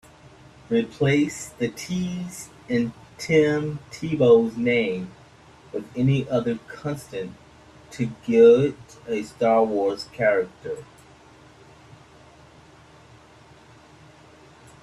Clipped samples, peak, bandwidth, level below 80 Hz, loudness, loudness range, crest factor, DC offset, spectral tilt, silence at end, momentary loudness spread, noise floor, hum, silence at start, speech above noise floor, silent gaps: under 0.1%; -4 dBFS; 12.5 kHz; -58 dBFS; -23 LUFS; 7 LU; 20 dB; under 0.1%; -6.5 dB/octave; 4 s; 18 LU; -50 dBFS; none; 0.7 s; 28 dB; none